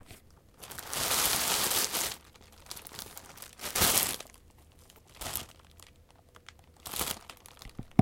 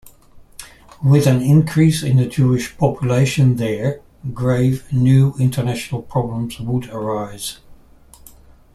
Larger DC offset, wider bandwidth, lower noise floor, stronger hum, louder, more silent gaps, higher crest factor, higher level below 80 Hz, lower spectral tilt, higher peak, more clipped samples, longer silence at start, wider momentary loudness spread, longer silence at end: neither; first, 17 kHz vs 13.5 kHz; first, -59 dBFS vs -45 dBFS; neither; second, -29 LUFS vs -17 LUFS; neither; first, 32 dB vs 16 dB; second, -56 dBFS vs -44 dBFS; second, -2 dB/octave vs -7 dB/octave; about the same, -2 dBFS vs -2 dBFS; neither; second, 0.1 s vs 0.35 s; first, 22 LU vs 13 LU; second, 0 s vs 1 s